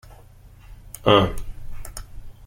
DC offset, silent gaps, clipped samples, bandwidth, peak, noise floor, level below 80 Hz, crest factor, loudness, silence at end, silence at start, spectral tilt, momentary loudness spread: under 0.1%; none; under 0.1%; 16.5 kHz; -2 dBFS; -47 dBFS; -36 dBFS; 24 dB; -19 LUFS; 0 s; 0.05 s; -5.5 dB/octave; 24 LU